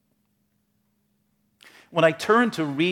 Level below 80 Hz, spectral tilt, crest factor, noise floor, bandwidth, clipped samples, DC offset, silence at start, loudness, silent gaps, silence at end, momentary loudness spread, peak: -74 dBFS; -5.5 dB/octave; 20 dB; -71 dBFS; 16.5 kHz; under 0.1%; under 0.1%; 1.9 s; -22 LUFS; none; 0 s; 5 LU; -6 dBFS